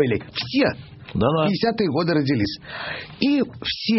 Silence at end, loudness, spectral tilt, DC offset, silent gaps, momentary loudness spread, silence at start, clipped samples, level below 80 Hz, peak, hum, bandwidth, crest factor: 0 s; -22 LUFS; -4.5 dB/octave; under 0.1%; none; 10 LU; 0 s; under 0.1%; -48 dBFS; -6 dBFS; none; 6 kHz; 16 dB